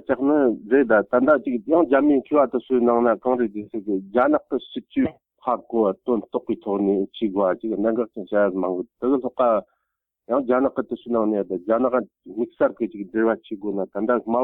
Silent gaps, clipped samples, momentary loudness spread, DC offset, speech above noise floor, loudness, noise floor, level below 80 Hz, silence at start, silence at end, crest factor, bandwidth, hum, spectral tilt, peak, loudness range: none; under 0.1%; 9 LU; under 0.1%; 58 dB; -22 LUFS; -79 dBFS; -62 dBFS; 0.1 s; 0 s; 16 dB; 4 kHz; none; -10 dB/octave; -6 dBFS; 5 LU